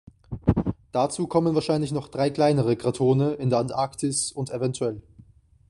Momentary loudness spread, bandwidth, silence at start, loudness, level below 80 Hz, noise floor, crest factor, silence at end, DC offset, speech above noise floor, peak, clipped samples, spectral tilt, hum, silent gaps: 7 LU; 11.5 kHz; 0.3 s; -25 LUFS; -46 dBFS; -53 dBFS; 18 dB; 0.7 s; under 0.1%; 30 dB; -6 dBFS; under 0.1%; -6 dB/octave; none; none